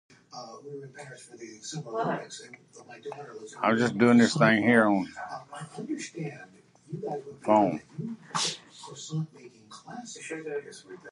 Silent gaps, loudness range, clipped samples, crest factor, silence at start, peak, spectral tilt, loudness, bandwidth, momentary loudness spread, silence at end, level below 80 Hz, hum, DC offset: none; 11 LU; under 0.1%; 22 dB; 0.35 s; -8 dBFS; -5 dB/octave; -27 LUFS; 11.5 kHz; 24 LU; 0 s; -72 dBFS; none; under 0.1%